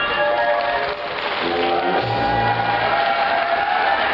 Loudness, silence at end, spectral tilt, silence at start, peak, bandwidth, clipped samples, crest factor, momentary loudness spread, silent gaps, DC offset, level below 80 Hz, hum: -19 LUFS; 0 s; -1.5 dB/octave; 0 s; -8 dBFS; 7 kHz; under 0.1%; 12 dB; 4 LU; none; under 0.1%; -46 dBFS; none